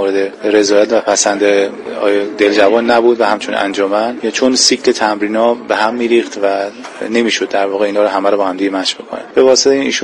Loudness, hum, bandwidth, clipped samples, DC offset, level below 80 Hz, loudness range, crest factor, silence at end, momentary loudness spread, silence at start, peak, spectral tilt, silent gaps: -12 LUFS; none; 11 kHz; under 0.1%; under 0.1%; -56 dBFS; 3 LU; 12 dB; 0 s; 7 LU; 0 s; 0 dBFS; -2 dB/octave; none